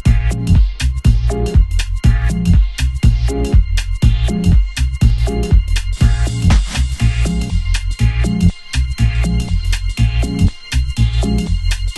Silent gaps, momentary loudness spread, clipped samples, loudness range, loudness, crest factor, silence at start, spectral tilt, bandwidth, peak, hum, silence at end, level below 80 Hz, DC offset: none; 5 LU; under 0.1%; 2 LU; -16 LUFS; 14 dB; 0.05 s; -6 dB/octave; 12 kHz; 0 dBFS; none; 0 s; -16 dBFS; under 0.1%